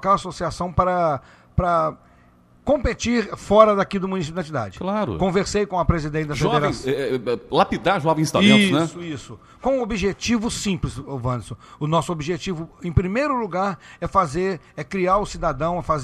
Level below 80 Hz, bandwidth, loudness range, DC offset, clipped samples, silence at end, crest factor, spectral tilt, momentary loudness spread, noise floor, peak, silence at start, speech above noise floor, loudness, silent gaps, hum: -38 dBFS; 13 kHz; 5 LU; under 0.1%; under 0.1%; 0 s; 22 dB; -5.5 dB/octave; 12 LU; -53 dBFS; 0 dBFS; 0 s; 32 dB; -22 LUFS; none; none